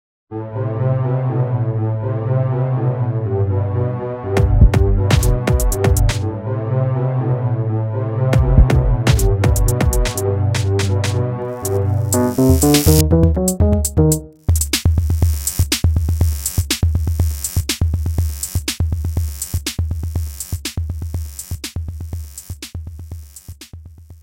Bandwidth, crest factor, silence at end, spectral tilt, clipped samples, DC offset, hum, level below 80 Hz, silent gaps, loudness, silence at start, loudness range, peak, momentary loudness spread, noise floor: 17 kHz; 16 dB; 0.05 s; -5.5 dB/octave; under 0.1%; under 0.1%; none; -22 dBFS; none; -18 LUFS; 0.3 s; 9 LU; 0 dBFS; 14 LU; -37 dBFS